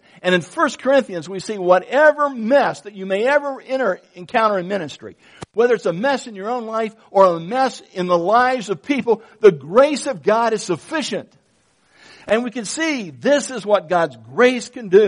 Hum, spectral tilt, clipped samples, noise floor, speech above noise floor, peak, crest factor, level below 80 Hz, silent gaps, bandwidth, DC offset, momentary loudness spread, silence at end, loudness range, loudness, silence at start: none; -4.5 dB/octave; under 0.1%; -60 dBFS; 42 dB; 0 dBFS; 18 dB; -64 dBFS; none; 10.5 kHz; under 0.1%; 11 LU; 0 s; 4 LU; -18 LUFS; 0.25 s